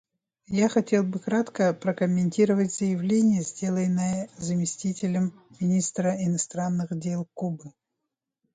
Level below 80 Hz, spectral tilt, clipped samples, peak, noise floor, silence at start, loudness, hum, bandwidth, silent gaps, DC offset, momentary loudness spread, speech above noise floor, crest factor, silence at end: -66 dBFS; -6 dB/octave; under 0.1%; -10 dBFS; -84 dBFS; 0.5 s; -26 LUFS; none; 9.4 kHz; none; under 0.1%; 8 LU; 59 dB; 16 dB; 0.85 s